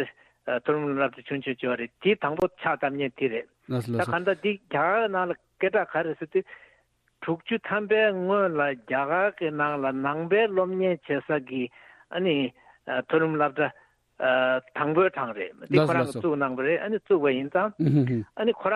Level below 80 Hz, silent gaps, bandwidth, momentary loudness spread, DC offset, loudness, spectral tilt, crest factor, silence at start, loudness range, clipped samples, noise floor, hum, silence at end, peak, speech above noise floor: -68 dBFS; none; 12 kHz; 9 LU; under 0.1%; -26 LUFS; -7.5 dB/octave; 18 dB; 0 s; 3 LU; under 0.1%; -67 dBFS; none; 0 s; -8 dBFS; 41 dB